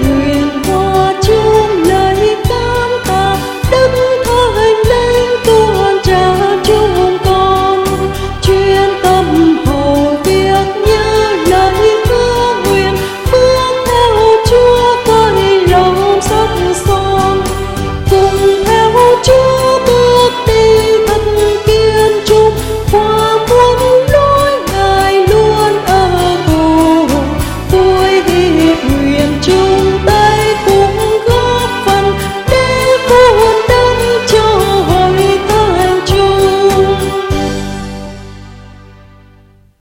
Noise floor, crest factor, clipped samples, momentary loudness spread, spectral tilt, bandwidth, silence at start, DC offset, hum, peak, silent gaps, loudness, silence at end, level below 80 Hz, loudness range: -43 dBFS; 10 dB; under 0.1%; 5 LU; -5 dB/octave; 17 kHz; 0 s; under 0.1%; none; 0 dBFS; none; -9 LUFS; 1.3 s; -24 dBFS; 2 LU